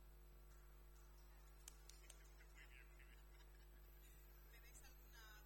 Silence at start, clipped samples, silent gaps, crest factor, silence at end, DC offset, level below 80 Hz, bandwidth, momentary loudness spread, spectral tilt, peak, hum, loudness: 0 s; under 0.1%; none; 26 dB; 0 s; under 0.1%; -64 dBFS; 17 kHz; 4 LU; -3 dB/octave; -38 dBFS; 50 Hz at -65 dBFS; -66 LUFS